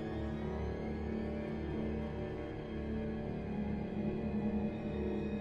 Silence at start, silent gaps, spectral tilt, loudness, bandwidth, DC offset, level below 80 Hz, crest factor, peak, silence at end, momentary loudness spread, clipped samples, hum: 0 s; none; -9 dB/octave; -39 LUFS; 6.8 kHz; under 0.1%; -48 dBFS; 12 dB; -26 dBFS; 0 s; 4 LU; under 0.1%; none